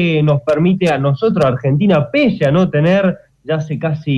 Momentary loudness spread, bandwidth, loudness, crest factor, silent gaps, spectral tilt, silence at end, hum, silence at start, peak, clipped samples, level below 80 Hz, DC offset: 7 LU; 8.8 kHz; -14 LUFS; 10 dB; none; -8 dB/octave; 0 s; none; 0 s; -4 dBFS; under 0.1%; -46 dBFS; under 0.1%